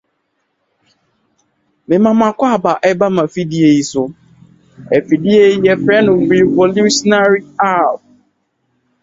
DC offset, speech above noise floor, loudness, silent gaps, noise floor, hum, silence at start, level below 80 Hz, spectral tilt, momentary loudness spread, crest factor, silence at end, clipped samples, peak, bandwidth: under 0.1%; 55 dB; -12 LUFS; none; -67 dBFS; none; 1.9 s; -54 dBFS; -5.5 dB/octave; 7 LU; 14 dB; 1.05 s; under 0.1%; 0 dBFS; 7.8 kHz